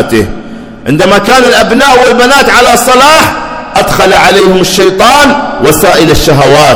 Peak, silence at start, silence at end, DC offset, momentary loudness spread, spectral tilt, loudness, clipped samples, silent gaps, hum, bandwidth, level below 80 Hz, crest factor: 0 dBFS; 0 s; 0 s; under 0.1%; 8 LU; -3.5 dB/octave; -4 LUFS; 20%; none; none; over 20 kHz; -26 dBFS; 4 dB